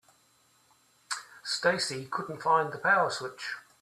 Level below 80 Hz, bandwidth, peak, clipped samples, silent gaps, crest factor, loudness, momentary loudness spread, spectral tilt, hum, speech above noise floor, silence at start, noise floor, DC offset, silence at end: -76 dBFS; 14 kHz; -10 dBFS; under 0.1%; none; 20 dB; -29 LUFS; 13 LU; -2.5 dB/octave; none; 37 dB; 1.1 s; -66 dBFS; under 0.1%; 0.2 s